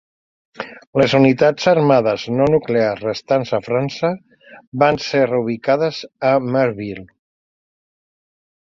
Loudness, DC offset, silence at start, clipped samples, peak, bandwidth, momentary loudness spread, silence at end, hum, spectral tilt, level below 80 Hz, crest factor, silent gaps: -17 LUFS; under 0.1%; 0.6 s; under 0.1%; -2 dBFS; 7.6 kHz; 16 LU; 1.6 s; none; -6.5 dB/octave; -54 dBFS; 18 dB; 0.87-0.93 s, 4.67-4.72 s